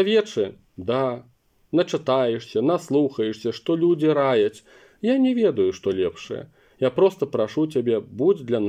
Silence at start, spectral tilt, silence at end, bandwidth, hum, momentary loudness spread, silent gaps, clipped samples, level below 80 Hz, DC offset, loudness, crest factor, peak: 0 s; -6.5 dB/octave; 0 s; 10.5 kHz; none; 8 LU; none; under 0.1%; -66 dBFS; under 0.1%; -22 LUFS; 16 dB; -8 dBFS